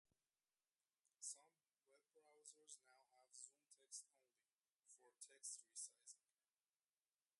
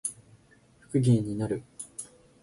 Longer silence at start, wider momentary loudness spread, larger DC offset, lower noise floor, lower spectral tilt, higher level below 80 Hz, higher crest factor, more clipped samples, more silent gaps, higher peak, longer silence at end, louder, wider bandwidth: first, 1.2 s vs 0.05 s; second, 11 LU vs 17 LU; neither; first, under -90 dBFS vs -60 dBFS; second, 3 dB/octave vs -7 dB/octave; second, under -90 dBFS vs -60 dBFS; first, 26 dB vs 18 dB; neither; first, 4.75-4.80 s vs none; second, -40 dBFS vs -12 dBFS; first, 1.25 s vs 0.35 s; second, -59 LUFS vs -29 LUFS; about the same, 11.5 kHz vs 11.5 kHz